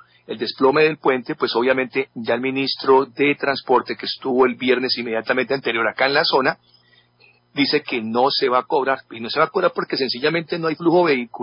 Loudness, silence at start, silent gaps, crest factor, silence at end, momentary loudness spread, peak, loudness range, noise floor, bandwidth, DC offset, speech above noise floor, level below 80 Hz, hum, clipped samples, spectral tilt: -19 LUFS; 0.3 s; none; 16 dB; 0 s; 8 LU; -4 dBFS; 2 LU; -56 dBFS; 5.6 kHz; under 0.1%; 36 dB; -66 dBFS; none; under 0.1%; -8.5 dB/octave